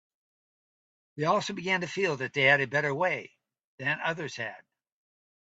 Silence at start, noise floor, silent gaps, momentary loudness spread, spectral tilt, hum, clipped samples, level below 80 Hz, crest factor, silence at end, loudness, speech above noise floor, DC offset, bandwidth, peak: 1.15 s; under -90 dBFS; 3.65-3.78 s; 12 LU; -4.5 dB/octave; none; under 0.1%; -74 dBFS; 22 dB; 0.9 s; -28 LUFS; over 61 dB; under 0.1%; 8 kHz; -10 dBFS